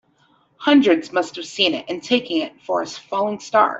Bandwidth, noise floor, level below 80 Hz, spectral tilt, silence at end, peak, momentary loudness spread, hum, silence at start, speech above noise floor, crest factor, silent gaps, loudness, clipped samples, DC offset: 8 kHz; -60 dBFS; -66 dBFS; -3.5 dB/octave; 0 s; -4 dBFS; 10 LU; none; 0.6 s; 40 dB; 18 dB; none; -20 LUFS; under 0.1%; under 0.1%